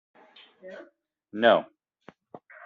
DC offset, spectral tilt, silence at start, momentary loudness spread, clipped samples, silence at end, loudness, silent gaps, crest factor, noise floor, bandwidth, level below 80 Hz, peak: under 0.1%; -1.5 dB/octave; 0.65 s; 26 LU; under 0.1%; 1 s; -23 LUFS; none; 24 dB; -56 dBFS; 5 kHz; -78 dBFS; -6 dBFS